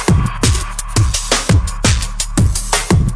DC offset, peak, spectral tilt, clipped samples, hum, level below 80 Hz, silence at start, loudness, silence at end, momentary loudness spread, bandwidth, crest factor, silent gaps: under 0.1%; 0 dBFS; -4 dB/octave; under 0.1%; none; -20 dBFS; 0 s; -15 LUFS; 0 s; 5 LU; 11 kHz; 14 dB; none